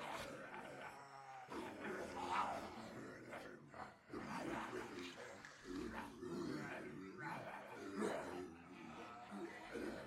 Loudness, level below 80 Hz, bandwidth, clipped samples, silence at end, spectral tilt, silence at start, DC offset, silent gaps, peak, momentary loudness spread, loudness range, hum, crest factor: -50 LUFS; -74 dBFS; 16 kHz; under 0.1%; 0 s; -5 dB/octave; 0 s; under 0.1%; none; -28 dBFS; 11 LU; 3 LU; none; 20 dB